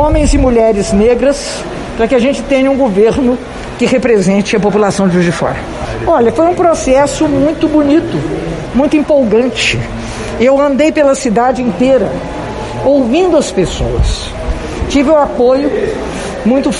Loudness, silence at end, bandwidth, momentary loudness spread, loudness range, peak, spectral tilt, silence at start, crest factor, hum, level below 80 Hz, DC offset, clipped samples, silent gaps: -11 LUFS; 0 s; 11.5 kHz; 10 LU; 2 LU; 0 dBFS; -5.5 dB/octave; 0 s; 10 dB; none; -24 dBFS; under 0.1%; under 0.1%; none